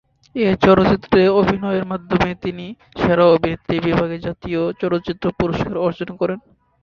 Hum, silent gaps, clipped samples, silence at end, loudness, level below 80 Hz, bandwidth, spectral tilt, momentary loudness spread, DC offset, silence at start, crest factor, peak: none; none; under 0.1%; 0.45 s; -18 LUFS; -42 dBFS; 7 kHz; -8 dB/octave; 13 LU; under 0.1%; 0.35 s; 18 dB; 0 dBFS